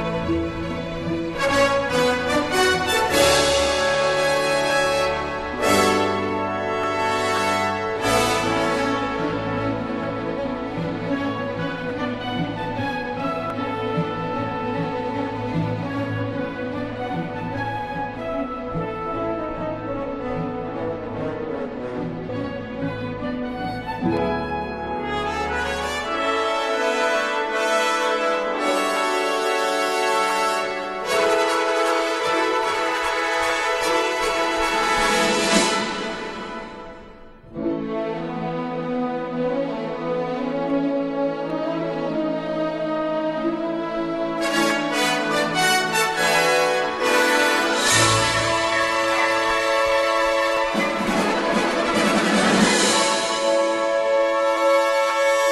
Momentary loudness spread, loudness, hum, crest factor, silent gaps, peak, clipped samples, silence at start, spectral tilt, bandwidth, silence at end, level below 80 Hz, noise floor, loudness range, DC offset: 10 LU; -21 LUFS; none; 18 dB; none; -4 dBFS; under 0.1%; 0 s; -3.5 dB/octave; 13 kHz; 0 s; -46 dBFS; -42 dBFS; 9 LU; under 0.1%